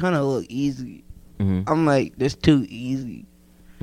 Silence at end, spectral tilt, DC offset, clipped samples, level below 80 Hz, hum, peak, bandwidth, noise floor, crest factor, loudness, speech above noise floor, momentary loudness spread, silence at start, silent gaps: 0.1 s; -7 dB/octave; under 0.1%; under 0.1%; -46 dBFS; none; -2 dBFS; 12.5 kHz; -50 dBFS; 22 dB; -22 LUFS; 28 dB; 16 LU; 0 s; none